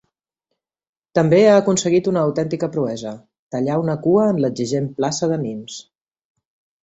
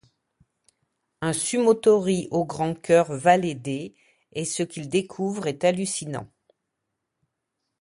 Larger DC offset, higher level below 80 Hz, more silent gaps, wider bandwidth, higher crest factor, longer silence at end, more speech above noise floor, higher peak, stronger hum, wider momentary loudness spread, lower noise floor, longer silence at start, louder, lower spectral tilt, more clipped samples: neither; about the same, -60 dBFS vs -62 dBFS; first, 3.39-3.47 s vs none; second, 8.2 kHz vs 11.5 kHz; about the same, 18 dB vs 20 dB; second, 1 s vs 1.55 s; about the same, 60 dB vs 58 dB; about the same, -2 dBFS vs -4 dBFS; neither; first, 16 LU vs 12 LU; about the same, -78 dBFS vs -81 dBFS; about the same, 1.15 s vs 1.2 s; first, -18 LUFS vs -24 LUFS; about the same, -6 dB/octave vs -5 dB/octave; neither